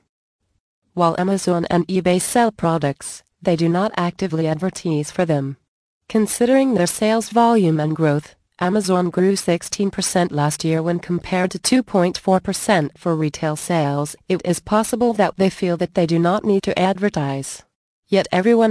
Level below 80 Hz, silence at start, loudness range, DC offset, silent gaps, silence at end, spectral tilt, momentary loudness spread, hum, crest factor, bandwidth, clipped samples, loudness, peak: -52 dBFS; 0.95 s; 2 LU; under 0.1%; 5.68-6.01 s, 17.75-18.03 s; 0 s; -5.5 dB/octave; 7 LU; none; 16 dB; 11 kHz; under 0.1%; -19 LUFS; -2 dBFS